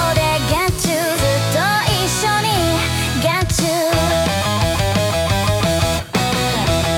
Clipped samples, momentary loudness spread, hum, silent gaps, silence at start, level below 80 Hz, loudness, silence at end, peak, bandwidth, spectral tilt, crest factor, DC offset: under 0.1%; 2 LU; none; none; 0 s; -32 dBFS; -17 LUFS; 0 s; -2 dBFS; 18 kHz; -4 dB/octave; 14 dB; under 0.1%